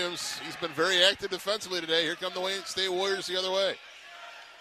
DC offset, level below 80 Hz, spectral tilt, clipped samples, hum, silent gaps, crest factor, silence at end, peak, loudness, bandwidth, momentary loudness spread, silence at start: under 0.1%; -70 dBFS; -1.5 dB/octave; under 0.1%; none; none; 24 dB; 0 s; -6 dBFS; -28 LUFS; 14.5 kHz; 21 LU; 0 s